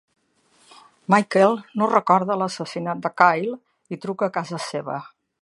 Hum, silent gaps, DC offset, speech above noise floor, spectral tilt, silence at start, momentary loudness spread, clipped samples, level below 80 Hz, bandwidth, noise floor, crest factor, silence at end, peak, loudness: none; none; under 0.1%; 40 dB; -5.5 dB/octave; 1.1 s; 15 LU; under 0.1%; -74 dBFS; 11.5 kHz; -61 dBFS; 22 dB; 0.4 s; 0 dBFS; -21 LUFS